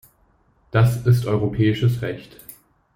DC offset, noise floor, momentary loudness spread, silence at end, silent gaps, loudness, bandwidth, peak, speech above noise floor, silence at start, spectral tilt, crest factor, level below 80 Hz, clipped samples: under 0.1%; -60 dBFS; 18 LU; 0.7 s; none; -20 LUFS; 16.5 kHz; -4 dBFS; 41 dB; 0.75 s; -7.5 dB/octave; 18 dB; -46 dBFS; under 0.1%